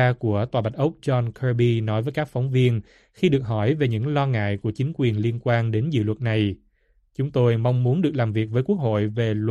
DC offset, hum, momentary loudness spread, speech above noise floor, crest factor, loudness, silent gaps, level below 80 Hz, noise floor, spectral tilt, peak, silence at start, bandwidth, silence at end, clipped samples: under 0.1%; none; 5 LU; 41 dB; 16 dB; -23 LUFS; none; -54 dBFS; -63 dBFS; -8.5 dB/octave; -6 dBFS; 0 s; 7.2 kHz; 0 s; under 0.1%